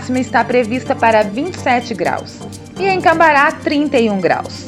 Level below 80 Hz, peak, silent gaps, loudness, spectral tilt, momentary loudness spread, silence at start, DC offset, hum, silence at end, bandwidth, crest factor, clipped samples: -50 dBFS; 0 dBFS; none; -14 LUFS; -5 dB/octave; 10 LU; 0 s; under 0.1%; none; 0 s; 14 kHz; 14 dB; under 0.1%